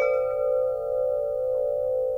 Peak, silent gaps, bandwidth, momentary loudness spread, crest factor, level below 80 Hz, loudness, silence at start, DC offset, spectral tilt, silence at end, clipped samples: -14 dBFS; none; 5.4 kHz; 2 LU; 12 dB; -54 dBFS; -26 LUFS; 0 s; under 0.1%; -6 dB/octave; 0 s; under 0.1%